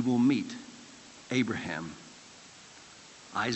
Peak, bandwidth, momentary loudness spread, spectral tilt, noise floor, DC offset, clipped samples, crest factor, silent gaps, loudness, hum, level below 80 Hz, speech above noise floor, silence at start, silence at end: -16 dBFS; 8.4 kHz; 23 LU; -5 dB/octave; -52 dBFS; under 0.1%; under 0.1%; 18 dB; none; -31 LUFS; none; -72 dBFS; 23 dB; 0 s; 0 s